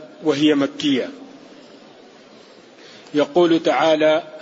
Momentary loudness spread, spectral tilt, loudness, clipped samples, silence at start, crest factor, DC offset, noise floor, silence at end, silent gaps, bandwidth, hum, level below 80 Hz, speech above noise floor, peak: 8 LU; -5 dB/octave; -18 LUFS; under 0.1%; 0 s; 16 dB; under 0.1%; -45 dBFS; 0 s; none; 8 kHz; none; -70 dBFS; 28 dB; -4 dBFS